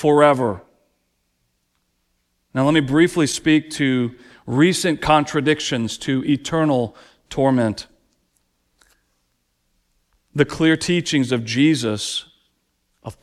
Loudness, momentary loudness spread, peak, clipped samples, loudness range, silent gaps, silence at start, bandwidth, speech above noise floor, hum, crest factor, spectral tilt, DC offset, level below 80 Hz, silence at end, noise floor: -19 LUFS; 13 LU; -2 dBFS; under 0.1%; 7 LU; none; 0 s; 13.5 kHz; 51 dB; none; 20 dB; -5 dB/octave; under 0.1%; -50 dBFS; 0.1 s; -69 dBFS